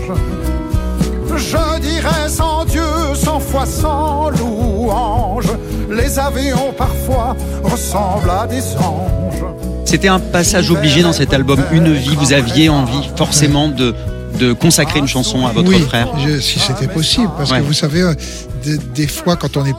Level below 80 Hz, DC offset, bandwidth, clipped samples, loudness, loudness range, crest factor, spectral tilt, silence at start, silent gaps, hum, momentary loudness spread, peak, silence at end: -24 dBFS; under 0.1%; 16.5 kHz; under 0.1%; -14 LUFS; 5 LU; 14 dB; -4.5 dB/octave; 0 s; none; none; 8 LU; 0 dBFS; 0 s